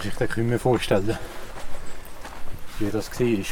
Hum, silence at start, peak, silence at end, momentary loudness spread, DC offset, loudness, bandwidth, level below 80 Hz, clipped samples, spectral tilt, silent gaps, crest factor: none; 0 s; -8 dBFS; 0 s; 18 LU; under 0.1%; -25 LUFS; 18 kHz; -38 dBFS; under 0.1%; -6 dB/octave; none; 16 dB